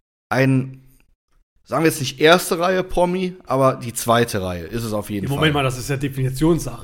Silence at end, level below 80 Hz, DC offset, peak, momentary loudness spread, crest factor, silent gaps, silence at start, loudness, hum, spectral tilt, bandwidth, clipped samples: 0 s; -40 dBFS; under 0.1%; 0 dBFS; 10 LU; 20 dB; 1.15-1.28 s, 1.43-1.56 s; 0.3 s; -19 LUFS; none; -5 dB/octave; 17 kHz; under 0.1%